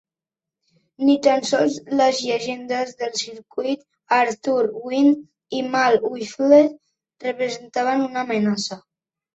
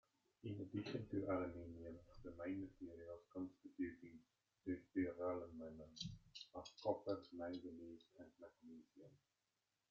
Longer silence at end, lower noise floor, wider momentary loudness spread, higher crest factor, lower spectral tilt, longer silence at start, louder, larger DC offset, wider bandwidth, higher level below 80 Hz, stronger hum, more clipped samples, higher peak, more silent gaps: second, 0.55 s vs 0.75 s; about the same, -89 dBFS vs under -90 dBFS; second, 11 LU vs 18 LU; about the same, 18 dB vs 22 dB; second, -4 dB/octave vs -5.5 dB/octave; first, 1 s vs 0.45 s; first, -21 LUFS vs -50 LUFS; neither; first, 8.2 kHz vs 7.4 kHz; first, -68 dBFS vs -76 dBFS; neither; neither; first, -2 dBFS vs -28 dBFS; neither